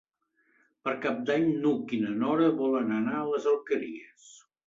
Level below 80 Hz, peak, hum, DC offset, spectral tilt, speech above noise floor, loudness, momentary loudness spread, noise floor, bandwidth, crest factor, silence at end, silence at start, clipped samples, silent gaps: -72 dBFS; -14 dBFS; none; under 0.1%; -7 dB/octave; 44 dB; -28 LUFS; 8 LU; -72 dBFS; 7.6 kHz; 16 dB; 0.3 s; 0.85 s; under 0.1%; none